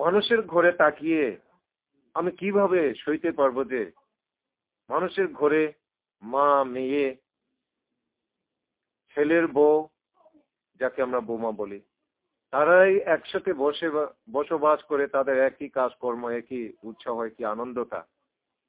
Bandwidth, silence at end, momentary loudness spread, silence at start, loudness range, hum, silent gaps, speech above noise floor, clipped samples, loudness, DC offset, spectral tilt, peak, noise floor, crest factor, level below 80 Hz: 4 kHz; 0.65 s; 13 LU; 0 s; 4 LU; none; none; 64 dB; under 0.1%; -25 LUFS; under 0.1%; -9 dB/octave; -6 dBFS; -88 dBFS; 20 dB; -70 dBFS